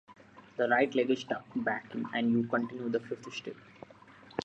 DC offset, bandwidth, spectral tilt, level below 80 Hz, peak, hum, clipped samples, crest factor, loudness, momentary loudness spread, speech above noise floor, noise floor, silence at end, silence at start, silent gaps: under 0.1%; 8 kHz; -6 dB/octave; -74 dBFS; -14 dBFS; none; under 0.1%; 20 dB; -32 LUFS; 20 LU; 24 dB; -55 dBFS; 0 s; 0.1 s; none